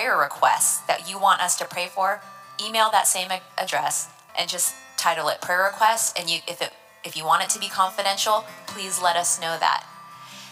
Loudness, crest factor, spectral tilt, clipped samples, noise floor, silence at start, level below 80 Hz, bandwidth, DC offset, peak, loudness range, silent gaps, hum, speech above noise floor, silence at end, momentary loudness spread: -22 LUFS; 20 dB; 0 dB/octave; under 0.1%; -43 dBFS; 0 s; -84 dBFS; 16.5 kHz; under 0.1%; -4 dBFS; 2 LU; none; none; 19 dB; 0 s; 12 LU